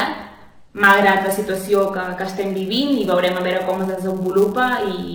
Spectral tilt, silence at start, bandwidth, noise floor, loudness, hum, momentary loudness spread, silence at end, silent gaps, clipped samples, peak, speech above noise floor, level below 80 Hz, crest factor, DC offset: -5 dB/octave; 0 s; over 20 kHz; -42 dBFS; -18 LUFS; none; 11 LU; 0 s; none; under 0.1%; 0 dBFS; 24 dB; -54 dBFS; 18 dB; under 0.1%